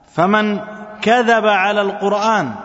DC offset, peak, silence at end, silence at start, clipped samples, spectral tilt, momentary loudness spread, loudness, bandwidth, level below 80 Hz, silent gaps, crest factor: under 0.1%; 0 dBFS; 0 s; 0.15 s; under 0.1%; -5 dB/octave; 8 LU; -15 LUFS; 8 kHz; -60 dBFS; none; 16 dB